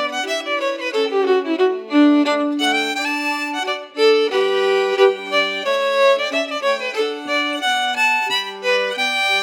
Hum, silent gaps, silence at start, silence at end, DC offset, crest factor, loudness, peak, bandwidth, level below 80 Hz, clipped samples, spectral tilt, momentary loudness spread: none; none; 0 s; 0 s; under 0.1%; 16 dB; -18 LUFS; -2 dBFS; 17.5 kHz; under -90 dBFS; under 0.1%; -1.5 dB/octave; 6 LU